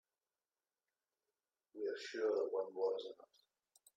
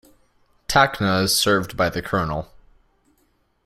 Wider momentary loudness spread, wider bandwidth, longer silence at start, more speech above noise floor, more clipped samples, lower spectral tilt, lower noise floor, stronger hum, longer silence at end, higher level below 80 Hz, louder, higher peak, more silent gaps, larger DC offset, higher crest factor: first, 17 LU vs 13 LU; second, 12 kHz vs 16 kHz; first, 1.75 s vs 0.7 s; first, over 49 dB vs 45 dB; neither; about the same, -3 dB/octave vs -3.5 dB/octave; first, under -90 dBFS vs -65 dBFS; neither; second, 0.85 s vs 1.2 s; second, under -90 dBFS vs -46 dBFS; second, -41 LUFS vs -20 LUFS; second, -28 dBFS vs -2 dBFS; neither; neither; about the same, 18 dB vs 22 dB